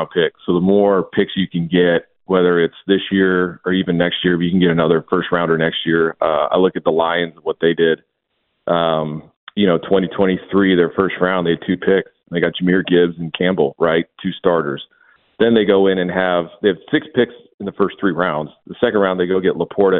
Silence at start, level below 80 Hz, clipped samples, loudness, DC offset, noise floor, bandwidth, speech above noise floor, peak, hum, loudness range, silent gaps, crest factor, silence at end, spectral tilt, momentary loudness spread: 0 s; -54 dBFS; under 0.1%; -17 LUFS; under 0.1%; -70 dBFS; 4.1 kHz; 54 dB; 0 dBFS; none; 2 LU; 9.36-9.47 s, 17.54-17.58 s; 16 dB; 0 s; -11.5 dB/octave; 6 LU